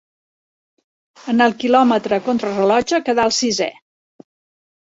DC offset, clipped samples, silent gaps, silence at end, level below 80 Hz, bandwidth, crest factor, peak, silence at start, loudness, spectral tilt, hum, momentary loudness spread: under 0.1%; under 0.1%; none; 1.15 s; -58 dBFS; 8 kHz; 18 dB; -2 dBFS; 1.25 s; -17 LUFS; -3.5 dB/octave; none; 7 LU